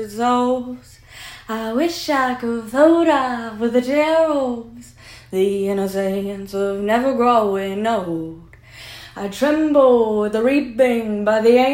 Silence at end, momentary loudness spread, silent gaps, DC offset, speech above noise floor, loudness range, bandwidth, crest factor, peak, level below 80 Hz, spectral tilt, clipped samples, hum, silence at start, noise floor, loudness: 0 s; 17 LU; none; under 0.1%; 22 dB; 3 LU; 16.5 kHz; 16 dB; -2 dBFS; -52 dBFS; -5.5 dB/octave; under 0.1%; none; 0 s; -40 dBFS; -18 LUFS